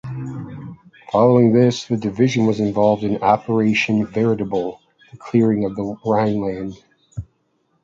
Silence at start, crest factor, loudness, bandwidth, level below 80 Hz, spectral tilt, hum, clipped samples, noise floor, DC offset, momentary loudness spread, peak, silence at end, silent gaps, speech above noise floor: 0.05 s; 18 dB; -18 LUFS; 7.6 kHz; -50 dBFS; -7 dB/octave; none; under 0.1%; -66 dBFS; under 0.1%; 18 LU; 0 dBFS; 0.6 s; none; 48 dB